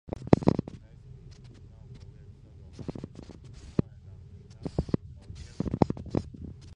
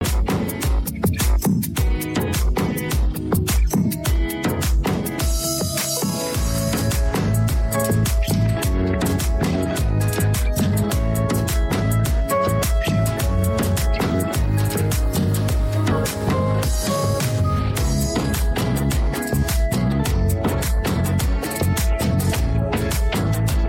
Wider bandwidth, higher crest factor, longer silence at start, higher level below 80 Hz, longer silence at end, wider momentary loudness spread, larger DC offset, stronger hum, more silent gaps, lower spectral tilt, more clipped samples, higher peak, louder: second, 9.8 kHz vs 17 kHz; first, 32 dB vs 10 dB; first, 0.15 s vs 0 s; second, -46 dBFS vs -24 dBFS; about the same, 0 s vs 0 s; first, 24 LU vs 2 LU; neither; neither; neither; first, -9 dB/octave vs -5.5 dB/octave; neither; first, -2 dBFS vs -10 dBFS; second, -31 LUFS vs -21 LUFS